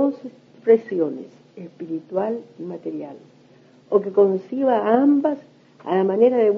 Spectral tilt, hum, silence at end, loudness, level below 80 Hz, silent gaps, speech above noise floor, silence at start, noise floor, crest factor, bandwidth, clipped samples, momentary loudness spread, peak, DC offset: -9 dB/octave; none; 0 s; -21 LUFS; -78 dBFS; none; 31 dB; 0 s; -52 dBFS; 18 dB; 6 kHz; under 0.1%; 20 LU; -4 dBFS; under 0.1%